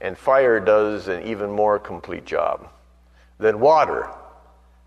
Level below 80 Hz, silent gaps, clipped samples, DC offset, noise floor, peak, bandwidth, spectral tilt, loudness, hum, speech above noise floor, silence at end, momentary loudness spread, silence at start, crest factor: -52 dBFS; none; under 0.1%; under 0.1%; -53 dBFS; -4 dBFS; 9.4 kHz; -6 dB/octave; -20 LUFS; none; 33 dB; 0.6 s; 14 LU; 0 s; 16 dB